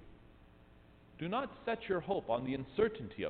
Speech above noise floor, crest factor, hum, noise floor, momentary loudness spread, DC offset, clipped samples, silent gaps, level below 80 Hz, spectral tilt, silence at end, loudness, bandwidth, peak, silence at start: 24 dB; 20 dB; none; -61 dBFS; 5 LU; under 0.1%; under 0.1%; none; -62 dBFS; -9 dB/octave; 0 s; -37 LUFS; 4.6 kHz; -20 dBFS; 0 s